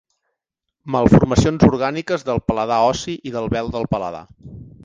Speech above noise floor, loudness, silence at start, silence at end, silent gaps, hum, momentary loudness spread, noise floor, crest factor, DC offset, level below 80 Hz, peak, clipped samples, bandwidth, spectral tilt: 62 dB; -18 LUFS; 0.85 s; 0.15 s; none; none; 12 LU; -80 dBFS; 18 dB; under 0.1%; -36 dBFS; 0 dBFS; under 0.1%; 9.6 kHz; -7 dB/octave